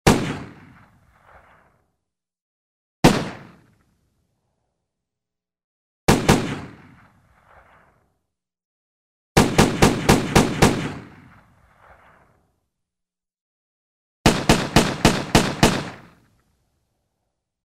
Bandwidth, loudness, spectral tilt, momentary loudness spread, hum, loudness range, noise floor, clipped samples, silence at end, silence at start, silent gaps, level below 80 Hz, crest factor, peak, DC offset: 16 kHz; -19 LUFS; -4.5 dB/octave; 18 LU; none; 7 LU; -87 dBFS; under 0.1%; 1.75 s; 0.05 s; 2.42-3.03 s, 5.64-6.07 s, 8.65-9.35 s, 13.41-14.24 s; -36 dBFS; 22 dB; 0 dBFS; under 0.1%